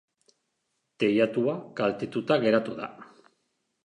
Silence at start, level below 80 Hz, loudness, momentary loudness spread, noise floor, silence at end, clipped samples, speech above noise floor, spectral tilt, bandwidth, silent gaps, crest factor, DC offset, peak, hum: 1 s; -74 dBFS; -26 LUFS; 12 LU; -78 dBFS; 0.8 s; under 0.1%; 52 dB; -7 dB/octave; 10.5 kHz; none; 20 dB; under 0.1%; -10 dBFS; none